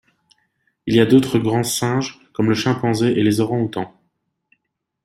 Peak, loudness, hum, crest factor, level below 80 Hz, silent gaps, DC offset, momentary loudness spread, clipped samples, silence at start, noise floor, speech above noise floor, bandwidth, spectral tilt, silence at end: -2 dBFS; -18 LUFS; none; 18 dB; -56 dBFS; none; under 0.1%; 13 LU; under 0.1%; 0.85 s; -76 dBFS; 59 dB; 16 kHz; -5.5 dB/octave; 1.2 s